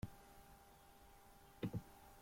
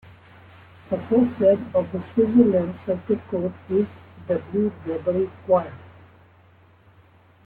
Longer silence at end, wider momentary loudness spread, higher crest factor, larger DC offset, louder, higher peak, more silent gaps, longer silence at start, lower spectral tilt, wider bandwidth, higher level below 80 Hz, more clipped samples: second, 0 s vs 1.6 s; first, 17 LU vs 11 LU; about the same, 22 dB vs 20 dB; neither; second, -52 LUFS vs -23 LUFS; second, -32 dBFS vs -4 dBFS; neither; second, 0 s vs 0.9 s; second, -6.5 dB/octave vs -11.5 dB/octave; first, 16.5 kHz vs 4.2 kHz; second, -66 dBFS vs -58 dBFS; neither